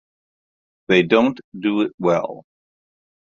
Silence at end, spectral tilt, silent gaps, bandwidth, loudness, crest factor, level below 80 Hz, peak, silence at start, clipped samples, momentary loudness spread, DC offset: 0.9 s; -6.5 dB/octave; 1.44-1.52 s, 1.94-1.98 s; 7.4 kHz; -19 LUFS; 22 dB; -62 dBFS; 0 dBFS; 0.9 s; under 0.1%; 9 LU; under 0.1%